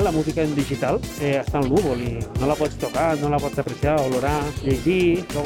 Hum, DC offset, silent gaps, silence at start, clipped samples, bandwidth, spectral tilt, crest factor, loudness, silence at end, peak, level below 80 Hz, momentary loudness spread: none; under 0.1%; none; 0 s; under 0.1%; 17.5 kHz; -6.5 dB/octave; 14 dB; -22 LUFS; 0 s; -8 dBFS; -36 dBFS; 4 LU